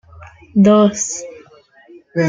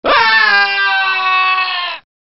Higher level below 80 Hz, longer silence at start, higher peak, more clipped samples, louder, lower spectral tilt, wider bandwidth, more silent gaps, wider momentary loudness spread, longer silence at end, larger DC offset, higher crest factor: about the same, -54 dBFS vs -52 dBFS; first, 0.2 s vs 0.05 s; about the same, -2 dBFS vs -2 dBFS; neither; second, -14 LUFS vs -11 LUFS; first, -5.5 dB/octave vs 3.5 dB/octave; first, 9.4 kHz vs 6 kHz; neither; first, 16 LU vs 9 LU; second, 0 s vs 0.25 s; neither; about the same, 16 dB vs 12 dB